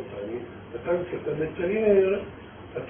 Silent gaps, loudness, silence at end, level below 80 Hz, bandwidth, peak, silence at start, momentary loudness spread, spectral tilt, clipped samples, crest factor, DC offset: none; -26 LUFS; 0 s; -52 dBFS; 3.5 kHz; -10 dBFS; 0 s; 18 LU; -11 dB/octave; under 0.1%; 18 dB; under 0.1%